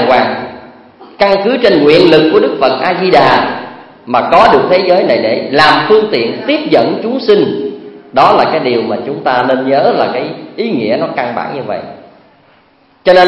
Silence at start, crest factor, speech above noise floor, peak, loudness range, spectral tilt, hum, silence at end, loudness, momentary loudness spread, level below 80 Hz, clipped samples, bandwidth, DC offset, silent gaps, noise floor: 0 s; 10 dB; 38 dB; 0 dBFS; 5 LU; -6.5 dB/octave; none; 0 s; -10 LUFS; 13 LU; -46 dBFS; 0.6%; 11 kHz; under 0.1%; none; -48 dBFS